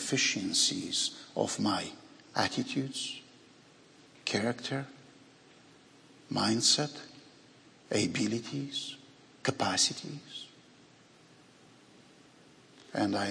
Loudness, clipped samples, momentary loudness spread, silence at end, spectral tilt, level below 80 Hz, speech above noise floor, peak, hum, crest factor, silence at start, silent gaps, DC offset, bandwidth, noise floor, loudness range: -31 LUFS; under 0.1%; 17 LU; 0 s; -2.5 dB/octave; -76 dBFS; 27 dB; -12 dBFS; none; 22 dB; 0 s; none; under 0.1%; 11 kHz; -59 dBFS; 7 LU